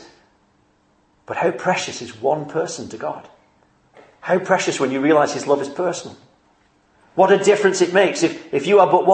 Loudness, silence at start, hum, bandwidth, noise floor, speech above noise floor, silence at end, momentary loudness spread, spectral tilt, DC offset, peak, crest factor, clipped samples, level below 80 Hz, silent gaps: -19 LUFS; 1.3 s; none; 8.8 kHz; -60 dBFS; 42 dB; 0 s; 15 LU; -4.5 dB/octave; under 0.1%; -2 dBFS; 18 dB; under 0.1%; -68 dBFS; none